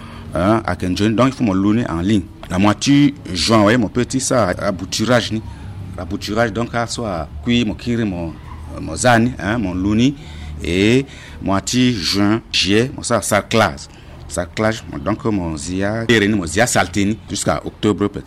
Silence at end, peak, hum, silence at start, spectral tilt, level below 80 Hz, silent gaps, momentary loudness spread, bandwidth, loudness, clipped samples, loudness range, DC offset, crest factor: 0.05 s; -2 dBFS; none; 0 s; -5 dB/octave; -38 dBFS; none; 13 LU; 15 kHz; -17 LUFS; under 0.1%; 4 LU; under 0.1%; 14 dB